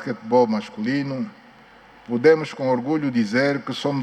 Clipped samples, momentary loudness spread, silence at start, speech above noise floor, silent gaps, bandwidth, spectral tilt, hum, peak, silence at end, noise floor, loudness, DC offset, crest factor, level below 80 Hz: under 0.1%; 11 LU; 0 s; 27 dB; none; 9.6 kHz; -6.5 dB/octave; none; -4 dBFS; 0 s; -48 dBFS; -21 LUFS; under 0.1%; 18 dB; -66 dBFS